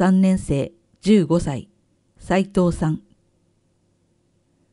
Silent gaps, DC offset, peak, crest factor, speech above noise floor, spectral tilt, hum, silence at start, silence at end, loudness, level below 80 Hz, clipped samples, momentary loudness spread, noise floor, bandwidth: none; under 0.1%; -4 dBFS; 18 dB; 46 dB; -7.5 dB/octave; none; 0 s; 1.75 s; -21 LUFS; -42 dBFS; under 0.1%; 13 LU; -64 dBFS; 11.5 kHz